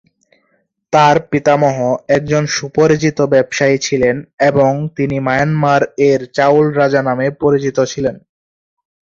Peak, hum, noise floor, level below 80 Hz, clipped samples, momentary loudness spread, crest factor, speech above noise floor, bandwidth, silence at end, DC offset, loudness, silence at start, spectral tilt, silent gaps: 0 dBFS; none; -62 dBFS; -48 dBFS; under 0.1%; 6 LU; 14 dB; 49 dB; 7.6 kHz; 0.85 s; under 0.1%; -14 LUFS; 0.9 s; -5.5 dB/octave; 4.33-4.38 s